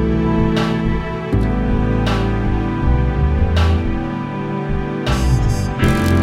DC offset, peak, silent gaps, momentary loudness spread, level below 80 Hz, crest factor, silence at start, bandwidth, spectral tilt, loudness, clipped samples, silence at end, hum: under 0.1%; -2 dBFS; none; 6 LU; -20 dBFS; 14 dB; 0 s; 15 kHz; -7 dB/octave; -18 LUFS; under 0.1%; 0 s; none